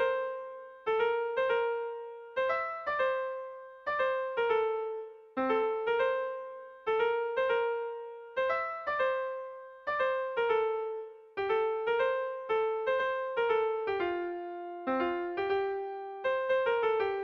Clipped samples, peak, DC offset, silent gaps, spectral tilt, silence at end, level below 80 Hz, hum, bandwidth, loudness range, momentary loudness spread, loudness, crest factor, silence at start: under 0.1%; -18 dBFS; under 0.1%; none; -5.5 dB/octave; 0 s; -70 dBFS; none; 6 kHz; 1 LU; 11 LU; -32 LUFS; 14 dB; 0 s